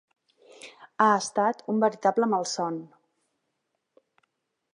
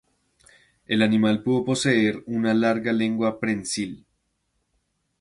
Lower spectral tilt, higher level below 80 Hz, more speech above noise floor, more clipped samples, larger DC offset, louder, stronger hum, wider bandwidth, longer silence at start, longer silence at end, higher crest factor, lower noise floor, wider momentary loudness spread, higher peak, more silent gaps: about the same, -4 dB/octave vs -5 dB/octave; second, -82 dBFS vs -62 dBFS; first, 55 dB vs 51 dB; neither; neither; about the same, -25 LUFS vs -23 LUFS; neither; about the same, 11 kHz vs 11.5 kHz; second, 0.65 s vs 0.9 s; first, 1.9 s vs 1.25 s; about the same, 22 dB vs 20 dB; first, -79 dBFS vs -73 dBFS; first, 23 LU vs 7 LU; about the same, -6 dBFS vs -4 dBFS; neither